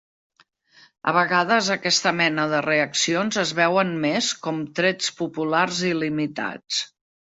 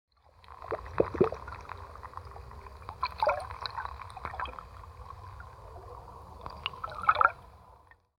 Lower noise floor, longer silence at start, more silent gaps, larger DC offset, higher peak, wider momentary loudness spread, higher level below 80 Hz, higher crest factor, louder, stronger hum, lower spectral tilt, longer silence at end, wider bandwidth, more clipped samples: about the same, -58 dBFS vs -58 dBFS; first, 1.05 s vs 0.4 s; neither; neither; about the same, -4 dBFS vs -6 dBFS; second, 8 LU vs 21 LU; second, -68 dBFS vs -52 dBFS; second, 20 dB vs 28 dB; first, -22 LUFS vs -32 LUFS; neither; second, -3 dB/octave vs -6 dB/octave; about the same, 0.5 s vs 0.4 s; second, 8.2 kHz vs 16.5 kHz; neither